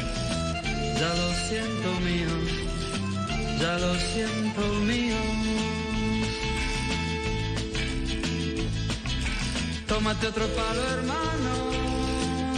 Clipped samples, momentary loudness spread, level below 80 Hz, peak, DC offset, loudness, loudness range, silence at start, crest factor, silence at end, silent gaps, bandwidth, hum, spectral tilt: under 0.1%; 4 LU; -36 dBFS; -14 dBFS; under 0.1%; -28 LUFS; 2 LU; 0 s; 12 dB; 0 s; none; 10.5 kHz; none; -4.5 dB/octave